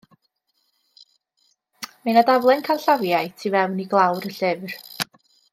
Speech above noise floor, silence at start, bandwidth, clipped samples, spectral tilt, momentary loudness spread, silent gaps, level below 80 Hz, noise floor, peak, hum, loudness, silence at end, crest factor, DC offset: 51 dB; 1.8 s; 16.5 kHz; under 0.1%; -5 dB/octave; 13 LU; none; -74 dBFS; -71 dBFS; -4 dBFS; none; -21 LUFS; 0.5 s; 20 dB; under 0.1%